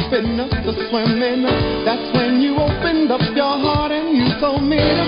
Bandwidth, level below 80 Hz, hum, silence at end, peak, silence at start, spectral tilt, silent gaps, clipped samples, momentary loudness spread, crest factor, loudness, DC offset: 5.4 kHz; -32 dBFS; none; 0 s; -2 dBFS; 0 s; -11 dB/octave; none; under 0.1%; 4 LU; 14 dB; -17 LUFS; under 0.1%